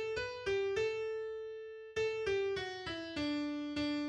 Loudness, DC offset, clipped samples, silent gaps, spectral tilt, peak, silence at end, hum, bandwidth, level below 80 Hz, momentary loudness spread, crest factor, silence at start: -38 LUFS; under 0.1%; under 0.1%; none; -4.5 dB/octave; -26 dBFS; 0 s; none; 10 kHz; -62 dBFS; 8 LU; 12 dB; 0 s